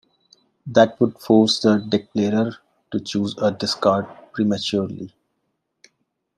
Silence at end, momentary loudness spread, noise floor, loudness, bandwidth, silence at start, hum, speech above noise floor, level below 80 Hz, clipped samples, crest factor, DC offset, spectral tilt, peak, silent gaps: 1.3 s; 13 LU; -74 dBFS; -20 LUFS; 12.5 kHz; 0.65 s; none; 55 dB; -62 dBFS; under 0.1%; 20 dB; under 0.1%; -5.5 dB/octave; -2 dBFS; none